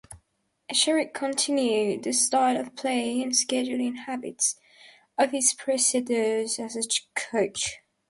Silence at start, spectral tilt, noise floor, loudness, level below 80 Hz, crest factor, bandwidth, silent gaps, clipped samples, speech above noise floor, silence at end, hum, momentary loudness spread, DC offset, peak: 0.1 s; -1.5 dB/octave; -73 dBFS; -25 LUFS; -68 dBFS; 18 dB; 12 kHz; none; under 0.1%; 47 dB; 0.3 s; none; 8 LU; under 0.1%; -8 dBFS